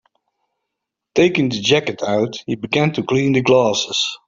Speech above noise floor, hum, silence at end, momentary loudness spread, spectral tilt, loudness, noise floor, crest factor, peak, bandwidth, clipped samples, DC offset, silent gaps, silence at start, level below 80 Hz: 63 dB; none; 0.1 s; 6 LU; -4.5 dB/octave; -17 LUFS; -80 dBFS; 16 dB; -2 dBFS; 7.8 kHz; under 0.1%; under 0.1%; none; 1.15 s; -56 dBFS